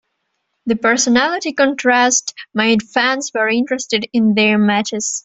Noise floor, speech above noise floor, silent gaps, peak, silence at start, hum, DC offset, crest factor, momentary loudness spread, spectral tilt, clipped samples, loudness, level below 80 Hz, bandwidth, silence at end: -71 dBFS; 55 dB; none; 0 dBFS; 0.65 s; none; under 0.1%; 16 dB; 6 LU; -3 dB/octave; under 0.1%; -15 LUFS; -58 dBFS; 8.4 kHz; 0.05 s